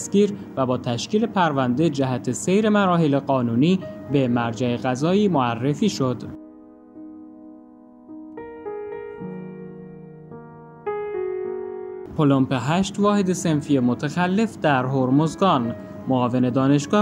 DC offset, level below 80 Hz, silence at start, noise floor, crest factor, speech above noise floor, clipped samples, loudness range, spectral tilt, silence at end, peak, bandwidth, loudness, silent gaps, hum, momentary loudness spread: under 0.1%; -58 dBFS; 0 s; -46 dBFS; 18 dB; 26 dB; under 0.1%; 16 LU; -6.5 dB/octave; 0 s; -4 dBFS; 13.5 kHz; -21 LUFS; none; none; 20 LU